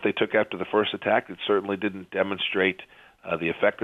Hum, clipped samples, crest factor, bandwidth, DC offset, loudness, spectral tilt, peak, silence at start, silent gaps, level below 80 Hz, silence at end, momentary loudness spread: none; under 0.1%; 18 dB; 4.9 kHz; under 0.1%; -26 LUFS; -7 dB/octave; -8 dBFS; 0 s; none; -66 dBFS; 0 s; 6 LU